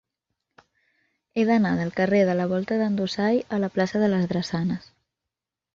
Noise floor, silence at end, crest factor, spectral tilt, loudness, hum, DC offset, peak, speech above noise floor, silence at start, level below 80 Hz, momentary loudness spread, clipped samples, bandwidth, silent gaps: -87 dBFS; 0.95 s; 16 dB; -7 dB/octave; -24 LUFS; none; under 0.1%; -8 dBFS; 64 dB; 1.35 s; -60 dBFS; 6 LU; under 0.1%; 7.6 kHz; none